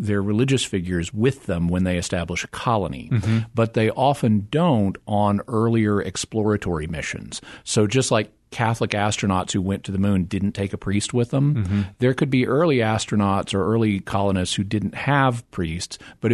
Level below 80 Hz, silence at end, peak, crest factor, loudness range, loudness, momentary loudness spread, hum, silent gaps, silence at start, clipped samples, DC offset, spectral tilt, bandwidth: -46 dBFS; 0 s; -2 dBFS; 20 dB; 2 LU; -22 LUFS; 7 LU; none; none; 0 s; under 0.1%; under 0.1%; -5.5 dB/octave; 12 kHz